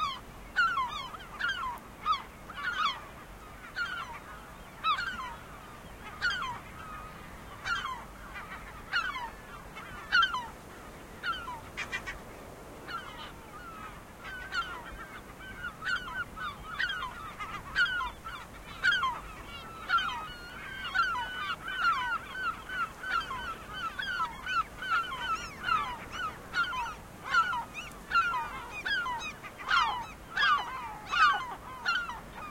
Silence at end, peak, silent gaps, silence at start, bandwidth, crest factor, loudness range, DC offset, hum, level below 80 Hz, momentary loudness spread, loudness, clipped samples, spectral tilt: 0 s; -12 dBFS; none; 0 s; 16.5 kHz; 22 dB; 8 LU; under 0.1%; none; -54 dBFS; 17 LU; -33 LUFS; under 0.1%; -2 dB/octave